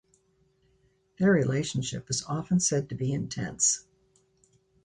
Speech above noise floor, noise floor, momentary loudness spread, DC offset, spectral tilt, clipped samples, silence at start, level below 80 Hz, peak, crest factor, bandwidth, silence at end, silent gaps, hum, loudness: 41 dB; -68 dBFS; 8 LU; under 0.1%; -4.5 dB/octave; under 0.1%; 1.2 s; -60 dBFS; -12 dBFS; 18 dB; 11 kHz; 1.05 s; none; none; -27 LUFS